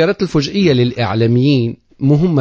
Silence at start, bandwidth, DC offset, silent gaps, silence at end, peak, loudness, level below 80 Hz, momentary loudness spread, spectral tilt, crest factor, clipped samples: 0 s; 8 kHz; under 0.1%; none; 0 s; 0 dBFS; -14 LUFS; -42 dBFS; 4 LU; -7.5 dB/octave; 12 dB; under 0.1%